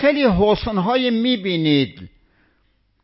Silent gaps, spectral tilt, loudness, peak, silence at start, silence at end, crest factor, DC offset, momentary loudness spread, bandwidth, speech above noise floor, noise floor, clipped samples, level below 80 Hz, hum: none; -10.5 dB/octave; -18 LUFS; -4 dBFS; 0 s; 0.95 s; 16 dB; under 0.1%; 4 LU; 5.8 kHz; 45 dB; -63 dBFS; under 0.1%; -40 dBFS; none